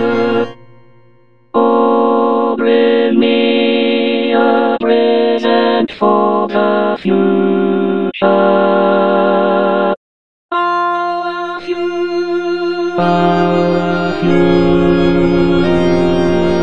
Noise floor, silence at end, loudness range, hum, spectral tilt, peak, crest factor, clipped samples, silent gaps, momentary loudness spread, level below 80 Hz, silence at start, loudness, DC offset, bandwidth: -50 dBFS; 0 s; 3 LU; none; -7.5 dB/octave; 0 dBFS; 12 dB; under 0.1%; 9.97-10.49 s; 6 LU; -40 dBFS; 0 s; -13 LUFS; under 0.1%; 7.4 kHz